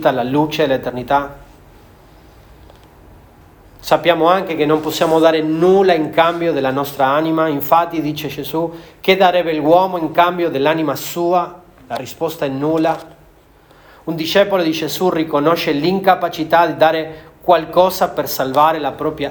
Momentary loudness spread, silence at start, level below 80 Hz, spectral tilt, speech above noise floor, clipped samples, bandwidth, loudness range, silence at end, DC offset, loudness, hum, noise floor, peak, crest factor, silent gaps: 10 LU; 0 s; -50 dBFS; -5.5 dB/octave; 32 dB; under 0.1%; over 20 kHz; 7 LU; 0 s; under 0.1%; -16 LUFS; none; -47 dBFS; 0 dBFS; 16 dB; none